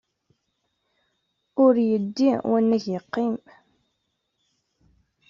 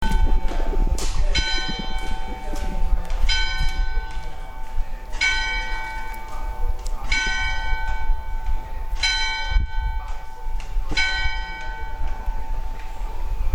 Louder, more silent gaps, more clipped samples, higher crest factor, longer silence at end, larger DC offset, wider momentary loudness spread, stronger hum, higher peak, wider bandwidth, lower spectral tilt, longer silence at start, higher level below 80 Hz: first, -22 LUFS vs -26 LUFS; neither; neither; about the same, 18 dB vs 16 dB; first, 1.95 s vs 0 s; neither; second, 10 LU vs 13 LU; neither; about the same, -8 dBFS vs -6 dBFS; second, 7.2 kHz vs 10 kHz; first, -6.5 dB/octave vs -3 dB/octave; first, 1.55 s vs 0 s; second, -70 dBFS vs -24 dBFS